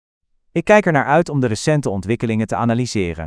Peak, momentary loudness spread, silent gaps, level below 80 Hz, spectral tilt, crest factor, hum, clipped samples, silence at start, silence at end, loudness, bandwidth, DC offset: 0 dBFS; 8 LU; none; -46 dBFS; -6 dB/octave; 18 dB; none; under 0.1%; 0.55 s; 0 s; -17 LUFS; 11 kHz; under 0.1%